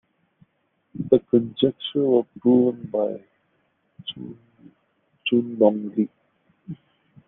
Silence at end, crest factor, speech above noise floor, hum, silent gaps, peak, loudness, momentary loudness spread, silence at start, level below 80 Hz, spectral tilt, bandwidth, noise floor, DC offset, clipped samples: 0.55 s; 22 dB; 49 dB; none; none; -2 dBFS; -22 LUFS; 22 LU; 0.95 s; -66 dBFS; -5.5 dB/octave; 3.9 kHz; -70 dBFS; under 0.1%; under 0.1%